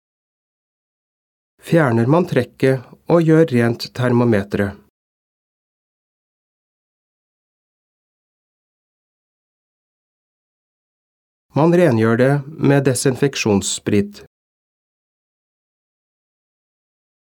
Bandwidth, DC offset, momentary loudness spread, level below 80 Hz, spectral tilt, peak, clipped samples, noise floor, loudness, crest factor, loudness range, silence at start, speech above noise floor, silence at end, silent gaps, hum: 18 kHz; under 0.1%; 7 LU; -58 dBFS; -6 dB/octave; -2 dBFS; under 0.1%; under -90 dBFS; -17 LUFS; 20 dB; 10 LU; 1.65 s; over 74 dB; 3.1 s; 4.90-11.49 s; none